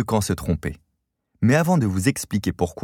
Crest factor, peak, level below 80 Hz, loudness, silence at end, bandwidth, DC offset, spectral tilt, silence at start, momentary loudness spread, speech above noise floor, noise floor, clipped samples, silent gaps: 18 dB; -4 dBFS; -42 dBFS; -22 LUFS; 0 s; 17.5 kHz; under 0.1%; -6 dB/octave; 0 s; 8 LU; 54 dB; -75 dBFS; under 0.1%; none